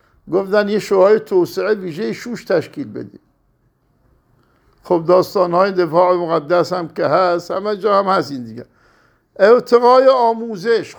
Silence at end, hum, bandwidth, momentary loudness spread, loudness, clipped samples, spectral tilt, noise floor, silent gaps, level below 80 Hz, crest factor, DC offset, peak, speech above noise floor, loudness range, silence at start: 0.05 s; none; over 20 kHz; 14 LU; -15 LUFS; under 0.1%; -6 dB/octave; -60 dBFS; none; -62 dBFS; 16 dB; under 0.1%; 0 dBFS; 45 dB; 7 LU; 0.25 s